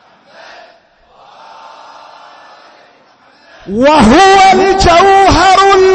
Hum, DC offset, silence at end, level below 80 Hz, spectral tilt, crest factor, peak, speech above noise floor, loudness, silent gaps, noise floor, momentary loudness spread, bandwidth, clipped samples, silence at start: none; under 0.1%; 0 s; -28 dBFS; -4 dB/octave; 10 dB; 0 dBFS; 40 dB; -6 LUFS; none; -45 dBFS; 4 LU; 8.8 kHz; under 0.1%; 3.65 s